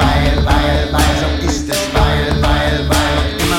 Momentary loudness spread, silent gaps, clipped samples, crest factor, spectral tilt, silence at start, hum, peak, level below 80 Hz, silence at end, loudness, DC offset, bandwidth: 3 LU; none; under 0.1%; 12 dB; -5 dB/octave; 0 s; none; -2 dBFS; -18 dBFS; 0 s; -14 LUFS; under 0.1%; 16.5 kHz